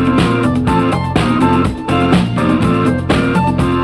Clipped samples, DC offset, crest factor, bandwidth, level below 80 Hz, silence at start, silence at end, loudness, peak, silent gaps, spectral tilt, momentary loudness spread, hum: under 0.1%; under 0.1%; 12 dB; 12 kHz; -30 dBFS; 0 s; 0 s; -13 LUFS; 0 dBFS; none; -7 dB/octave; 2 LU; none